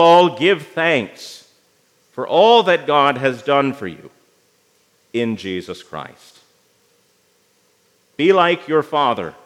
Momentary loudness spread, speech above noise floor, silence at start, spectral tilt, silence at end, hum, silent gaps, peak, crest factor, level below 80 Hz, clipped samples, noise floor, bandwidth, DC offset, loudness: 21 LU; 43 dB; 0 s; -5.5 dB/octave; 0.15 s; none; none; 0 dBFS; 18 dB; -70 dBFS; under 0.1%; -60 dBFS; 13.5 kHz; under 0.1%; -16 LUFS